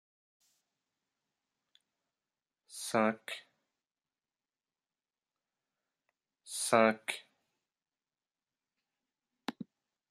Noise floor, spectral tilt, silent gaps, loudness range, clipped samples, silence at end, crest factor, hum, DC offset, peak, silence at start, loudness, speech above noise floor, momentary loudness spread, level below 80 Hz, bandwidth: under -90 dBFS; -3.5 dB/octave; none; 10 LU; under 0.1%; 0.45 s; 30 dB; none; under 0.1%; -10 dBFS; 2.7 s; -32 LUFS; over 59 dB; 21 LU; -84 dBFS; 14.5 kHz